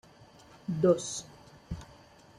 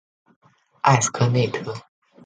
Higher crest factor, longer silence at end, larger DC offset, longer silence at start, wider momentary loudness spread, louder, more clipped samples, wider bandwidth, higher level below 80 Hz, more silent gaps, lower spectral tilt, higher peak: about the same, 22 dB vs 22 dB; about the same, 0.55 s vs 0.45 s; neither; second, 0.7 s vs 0.85 s; first, 22 LU vs 15 LU; second, -30 LUFS vs -20 LUFS; neither; first, 12 kHz vs 9.4 kHz; about the same, -58 dBFS vs -58 dBFS; neither; about the same, -5.5 dB/octave vs -4.5 dB/octave; second, -12 dBFS vs -2 dBFS